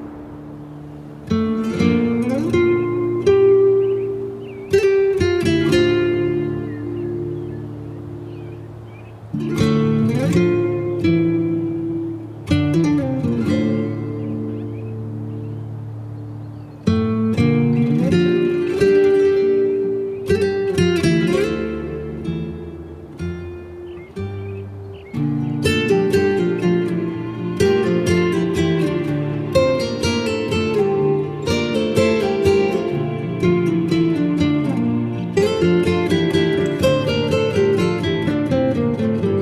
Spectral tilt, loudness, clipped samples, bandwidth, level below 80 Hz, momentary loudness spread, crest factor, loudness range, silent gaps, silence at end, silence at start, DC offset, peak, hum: -7 dB/octave; -19 LUFS; under 0.1%; 13.5 kHz; -46 dBFS; 15 LU; 16 dB; 8 LU; none; 0 s; 0 s; under 0.1%; -2 dBFS; none